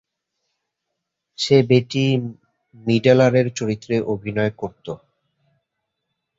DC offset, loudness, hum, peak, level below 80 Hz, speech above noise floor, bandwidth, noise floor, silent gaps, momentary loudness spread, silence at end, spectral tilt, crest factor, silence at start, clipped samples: under 0.1%; -19 LUFS; none; -2 dBFS; -58 dBFS; 61 dB; 8 kHz; -79 dBFS; none; 18 LU; 1.45 s; -6.5 dB/octave; 20 dB; 1.4 s; under 0.1%